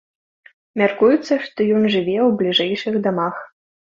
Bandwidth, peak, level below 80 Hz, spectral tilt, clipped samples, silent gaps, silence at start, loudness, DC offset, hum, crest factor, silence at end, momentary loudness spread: 7.4 kHz; -2 dBFS; -62 dBFS; -6 dB/octave; under 0.1%; none; 0.75 s; -18 LUFS; under 0.1%; none; 18 dB; 0.5 s; 8 LU